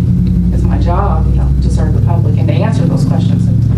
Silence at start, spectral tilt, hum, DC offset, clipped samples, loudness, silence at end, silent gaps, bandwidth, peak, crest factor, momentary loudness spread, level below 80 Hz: 0 s; -9 dB/octave; none; under 0.1%; under 0.1%; -12 LUFS; 0 s; none; 10.5 kHz; 0 dBFS; 10 dB; 1 LU; -16 dBFS